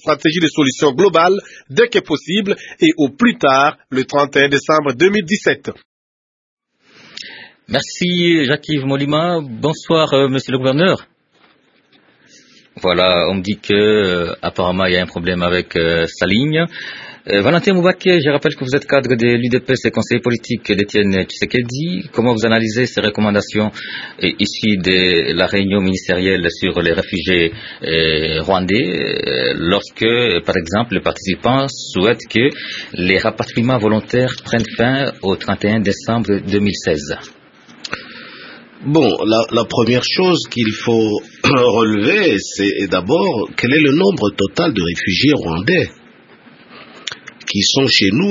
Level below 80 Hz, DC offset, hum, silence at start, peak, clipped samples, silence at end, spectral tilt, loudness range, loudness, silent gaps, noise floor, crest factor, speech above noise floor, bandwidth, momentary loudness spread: -46 dBFS; under 0.1%; none; 0.05 s; 0 dBFS; under 0.1%; 0 s; -5 dB/octave; 4 LU; -15 LUFS; 5.85-6.57 s; -54 dBFS; 16 dB; 39 dB; 7.8 kHz; 8 LU